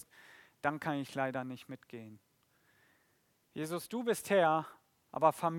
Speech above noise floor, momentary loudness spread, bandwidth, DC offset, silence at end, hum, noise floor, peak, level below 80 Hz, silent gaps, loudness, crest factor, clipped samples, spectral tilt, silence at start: 40 dB; 21 LU; 17.5 kHz; under 0.1%; 0 s; none; -74 dBFS; -14 dBFS; -82 dBFS; none; -34 LUFS; 22 dB; under 0.1%; -5 dB/octave; 0.2 s